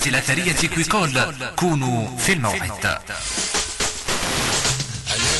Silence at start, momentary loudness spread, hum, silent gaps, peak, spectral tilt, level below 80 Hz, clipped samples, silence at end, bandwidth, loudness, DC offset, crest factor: 0 s; 5 LU; none; none; -6 dBFS; -3 dB/octave; -40 dBFS; under 0.1%; 0 s; 12 kHz; -20 LUFS; under 0.1%; 16 dB